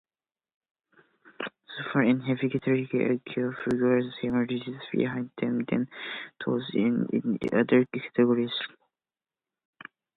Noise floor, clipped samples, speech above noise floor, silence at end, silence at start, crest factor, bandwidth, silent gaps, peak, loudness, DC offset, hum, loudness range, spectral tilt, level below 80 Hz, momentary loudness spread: under -90 dBFS; under 0.1%; over 63 dB; 1.5 s; 1.4 s; 20 dB; 4.5 kHz; none; -8 dBFS; -28 LUFS; under 0.1%; none; 2 LU; -8.5 dB/octave; -68 dBFS; 13 LU